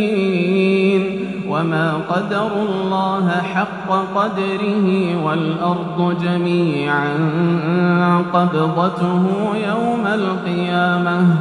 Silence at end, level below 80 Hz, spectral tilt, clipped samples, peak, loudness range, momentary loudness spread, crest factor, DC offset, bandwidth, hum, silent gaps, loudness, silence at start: 0 s; -56 dBFS; -8 dB/octave; under 0.1%; -2 dBFS; 2 LU; 5 LU; 16 dB; under 0.1%; 10 kHz; none; none; -18 LUFS; 0 s